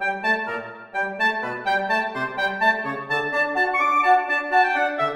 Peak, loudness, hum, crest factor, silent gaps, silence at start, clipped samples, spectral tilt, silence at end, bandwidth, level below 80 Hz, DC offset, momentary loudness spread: -6 dBFS; -21 LUFS; none; 16 dB; none; 0 s; under 0.1%; -4 dB/octave; 0 s; 14 kHz; -64 dBFS; under 0.1%; 8 LU